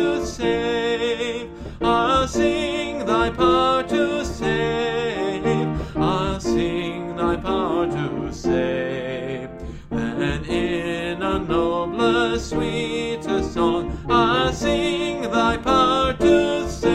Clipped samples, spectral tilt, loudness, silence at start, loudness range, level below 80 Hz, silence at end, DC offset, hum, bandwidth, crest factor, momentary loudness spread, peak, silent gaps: under 0.1%; -5.5 dB/octave; -21 LUFS; 0 s; 4 LU; -38 dBFS; 0 s; under 0.1%; none; 11 kHz; 16 dB; 8 LU; -4 dBFS; none